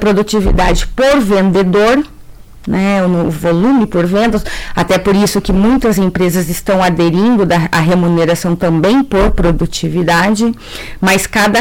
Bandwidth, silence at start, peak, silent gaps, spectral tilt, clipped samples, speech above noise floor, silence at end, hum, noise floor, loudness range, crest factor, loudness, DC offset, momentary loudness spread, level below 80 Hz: 17 kHz; 0 s; -4 dBFS; none; -5.5 dB/octave; under 0.1%; 22 dB; 0 s; none; -33 dBFS; 1 LU; 8 dB; -12 LUFS; 0.8%; 5 LU; -24 dBFS